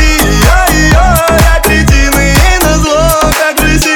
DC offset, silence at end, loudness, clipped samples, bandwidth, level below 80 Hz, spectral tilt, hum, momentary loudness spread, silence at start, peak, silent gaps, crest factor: under 0.1%; 0 s; -7 LUFS; 0.3%; over 20 kHz; -10 dBFS; -4 dB/octave; none; 2 LU; 0 s; 0 dBFS; none; 6 dB